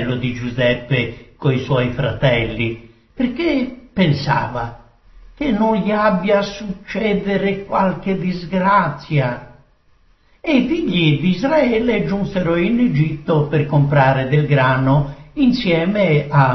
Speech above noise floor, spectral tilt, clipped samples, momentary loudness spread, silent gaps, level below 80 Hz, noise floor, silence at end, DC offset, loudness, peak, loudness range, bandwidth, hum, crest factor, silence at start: 37 dB; -5.5 dB/octave; under 0.1%; 8 LU; none; -40 dBFS; -53 dBFS; 0 s; under 0.1%; -17 LUFS; -2 dBFS; 4 LU; 6.2 kHz; none; 16 dB; 0 s